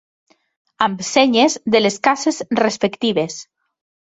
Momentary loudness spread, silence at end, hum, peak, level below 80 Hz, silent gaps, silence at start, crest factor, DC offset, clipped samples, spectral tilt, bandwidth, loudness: 7 LU; 0.6 s; none; 0 dBFS; -62 dBFS; none; 0.8 s; 18 dB; under 0.1%; under 0.1%; -3.5 dB/octave; 8.4 kHz; -17 LUFS